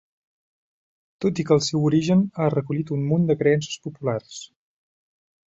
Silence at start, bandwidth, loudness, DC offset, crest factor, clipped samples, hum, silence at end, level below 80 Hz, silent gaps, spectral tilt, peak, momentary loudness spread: 1.2 s; 8 kHz; -22 LUFS; under 0.1%; 20 dB; under 0.1%; none; 1.05 s; -60 dBFS; none; -6.5 dB/octave; -4 dBFS; 11 LU